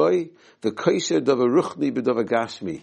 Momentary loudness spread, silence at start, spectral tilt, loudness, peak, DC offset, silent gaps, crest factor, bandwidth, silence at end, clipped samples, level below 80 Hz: 10 LU; 0 s; -5 dB/octave; -22 LUFS; -6 dBFS; under 0.1%; none; 16 dB; 9.2 kHz; 0 s; under 0.1%; -68 dBFS